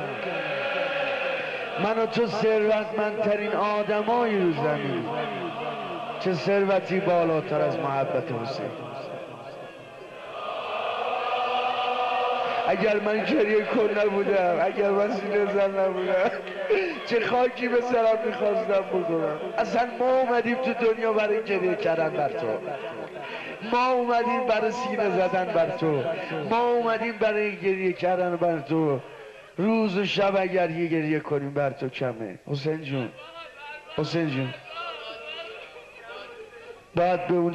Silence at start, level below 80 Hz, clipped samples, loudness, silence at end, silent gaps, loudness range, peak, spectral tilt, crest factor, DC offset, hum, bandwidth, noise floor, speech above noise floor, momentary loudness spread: 0 s; -66 dBFS; under 0.1%; -25 LUFS; 0 s; none; 7 LU; -12 dBFS; -6.5 dB/octave; 12 dB; under 0.1%; none; 10.5 kHz; -45 dBFS; 21 dB; 13 LU